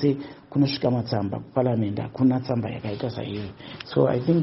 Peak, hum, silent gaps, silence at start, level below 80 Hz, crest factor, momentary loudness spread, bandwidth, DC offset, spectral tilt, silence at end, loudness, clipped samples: -6 dBFS; none; none; 0 s; -58 dBFS; 20 dB; 10 LU; 6 kHz; under 0.1%; -7 dB/octave; 0 s; -25 LUFS; under 0.1%